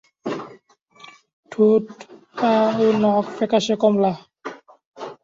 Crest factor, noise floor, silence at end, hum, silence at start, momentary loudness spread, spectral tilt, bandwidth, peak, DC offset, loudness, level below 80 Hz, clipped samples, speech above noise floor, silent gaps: 18 dB; -52 dBFS; 0.1 s; none; 0.25 s; 20 LU; -6 dB/octave; 7.6 kHz; -4 dBFS; under 0.1%; -19 LUFS; -64 dBFS; under 0.1%; 34 dB; 0.82-0.86 s, 1.33-1.43 s, 4.86-4.94 s